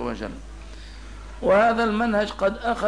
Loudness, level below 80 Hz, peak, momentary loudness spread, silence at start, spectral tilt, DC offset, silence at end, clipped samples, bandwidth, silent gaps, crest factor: -22 LUFS; -40 dBFS; -8 dBFS; 23 LU; 0 s; -6 dB/octave; 0.3%; 0 s; under 0.1%; 10.5 kHz; none; 16 dB